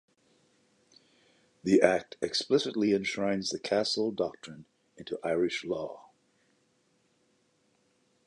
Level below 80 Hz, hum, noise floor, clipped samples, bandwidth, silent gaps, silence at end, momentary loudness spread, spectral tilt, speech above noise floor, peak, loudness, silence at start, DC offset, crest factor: -70 dBFS; none; -71 dBFS; under 0.1%; 11 kHz; none; 2.25 s; 17 LU; -4.5 dB/octave; 42 dB; -8 dBFS; -29 LUFS; 1.65 s; under 0.1%; 24 dB